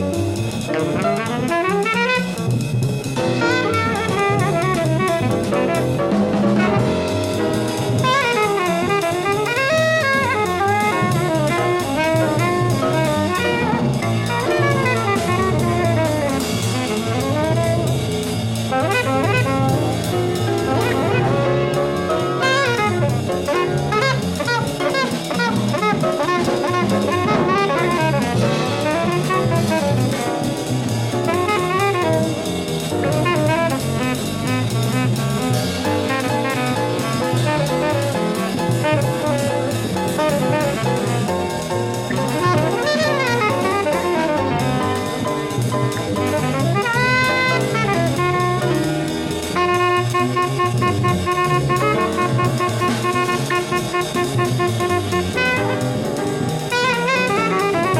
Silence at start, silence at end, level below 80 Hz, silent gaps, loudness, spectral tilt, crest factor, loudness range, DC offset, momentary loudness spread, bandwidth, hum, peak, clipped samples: 0 s; 0 s; -44 dBFS; none; -18 LUFS; -5.5 dB/octave; 14 dB; 2 LU; under 0.1%; 4 LU; 16 kHz; none; -4 dBFS; under 0.1%